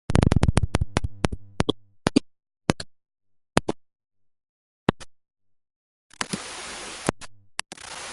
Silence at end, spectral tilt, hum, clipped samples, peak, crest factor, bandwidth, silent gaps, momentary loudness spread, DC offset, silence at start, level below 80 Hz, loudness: 0 s; -5.5 dB/octave; none; under 0.1%; 0 dBFS; 28 dB; 11.5 kHz; 4.49-4.87 s, 5.76-6.10 s; 13 LU; under 0.1%; 0.1 s; -36 dBFS; -27 LUFS